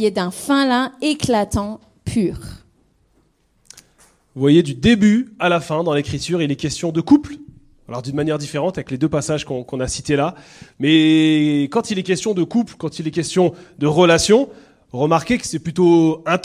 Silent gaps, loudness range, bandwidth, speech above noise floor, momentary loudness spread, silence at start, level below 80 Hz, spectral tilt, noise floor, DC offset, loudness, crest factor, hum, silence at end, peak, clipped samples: none; 6 LU; 14.5 kHz; 43 dB; 11 LU; 0 s; -44 dBFS; -5.5 dB/octave; -60 dBFS; under 0.1%; -18 LUFS; 16 dB; none; 0 s; -2 dBFS; under 0.1%